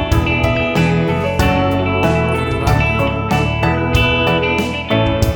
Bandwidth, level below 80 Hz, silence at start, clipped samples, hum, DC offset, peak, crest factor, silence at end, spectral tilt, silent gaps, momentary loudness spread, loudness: over 20 kHz; -26 dBFS; 0 s; under 0.1%; none; under 0.1%; -2 dBFS; 14 dB; 0 s; -6 dB/octave; none; 3 LU; -15 LUFS